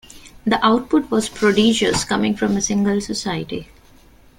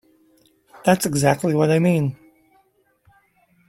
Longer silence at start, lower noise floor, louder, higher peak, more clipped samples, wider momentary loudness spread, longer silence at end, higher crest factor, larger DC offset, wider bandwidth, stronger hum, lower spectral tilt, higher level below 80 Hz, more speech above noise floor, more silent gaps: second, 0.15 s vs 0.85 s; second, -48 dBFS vs -62 dBFS; about the same, -18 LUFS vs -19 LUFS; about the same, -2 dBFS vs -2 dBFS; neither; first, 10 LU vs 6 LU; second, 0.75 s vs 1.55 s; about the same, 16 dB vs 20 dB; neither; about the same, 16 kHz vs 16.5 kHz; neither; second, -4 dB/octave vs -6 dB/octave; first, -46 dBFS vs -58 dBFS; second, 30 dB vs 44 dB; neither